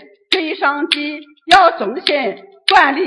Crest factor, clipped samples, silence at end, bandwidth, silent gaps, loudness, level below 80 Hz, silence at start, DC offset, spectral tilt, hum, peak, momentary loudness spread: 16 dB; 0.2%; 0 s; 12 kHz; none; -14 LUFS; -54 dBFS; 0.3 s; under 0.1%; -2.5 dB/octave; none; 0 dBFS; 11 LU